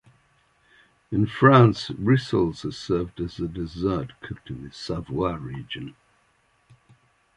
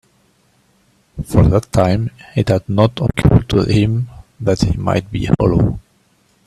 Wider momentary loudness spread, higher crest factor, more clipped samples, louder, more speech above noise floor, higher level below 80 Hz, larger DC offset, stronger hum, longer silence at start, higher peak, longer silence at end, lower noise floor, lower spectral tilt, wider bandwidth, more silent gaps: first, 20 LU vs 9 LU; first, 22 dB vs 16 dB; neither; second, -23 LUFS vs -16 LUFS; about the same, 42 dB vs 42 dB; second, -48 dBFS vs -30 dBFS; neither; neither; about the same, 1.1 s vs 1.15 s; about the same, -2 dBFS vs 0 dBFS; first, 1.45 s vs 0.65 s; first, -65 dBFS vs -57 dBFS; about the same, -7.5 dB/octave vs -7.5 dB/octave; second, 10 kHz vs 13 kHz; neither